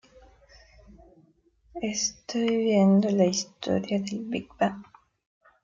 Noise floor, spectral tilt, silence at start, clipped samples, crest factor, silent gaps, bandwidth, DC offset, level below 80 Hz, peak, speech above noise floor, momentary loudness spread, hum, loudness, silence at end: -63 dBFS; -5 dB/octave; 1.75 s; under 0.1%; 18 dB; none; 7.6 kHz; under 0.1%; -62 dBFS; -10 dBFS; 38 dB; 13 LU; none; -26 LUFS; 0.8 s